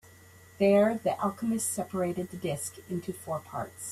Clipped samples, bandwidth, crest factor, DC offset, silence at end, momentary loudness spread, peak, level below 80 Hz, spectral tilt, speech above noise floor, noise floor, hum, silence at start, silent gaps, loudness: under 0.1%; 15.5 kHz; 18 dB; under 0.1%; 0 s; 13 LU; -12 dBFS; -66 dBFS; -5.5 dB/octave; 25 dB; -54 dBFS; none; 0.6 s; none; -30 LUFS